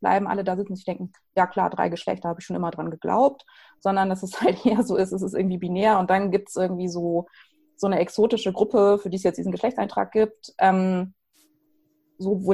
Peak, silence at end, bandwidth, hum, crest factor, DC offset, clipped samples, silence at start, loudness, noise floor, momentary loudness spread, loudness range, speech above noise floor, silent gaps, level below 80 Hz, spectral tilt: -6 dBFS; 0 s; 12 kHz; none; 18 dB; under 0.1%; under 0.1%; 0 s; -24 LUFS; -67 dBFS; 9 LU; 3 LU; 44 dB; none; -60 dBFS; -6.5 dB/octave